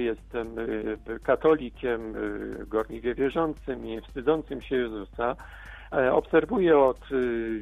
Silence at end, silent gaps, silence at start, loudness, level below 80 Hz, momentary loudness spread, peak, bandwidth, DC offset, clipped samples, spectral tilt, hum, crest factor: 0 s; none; 0 s; -27 LUFS; -46 dBFS; 12 LU; -8 dBFS; 9.4 kHz; under 0.1%; under 0.1%; -7.5 dB/octave; none; 18 dB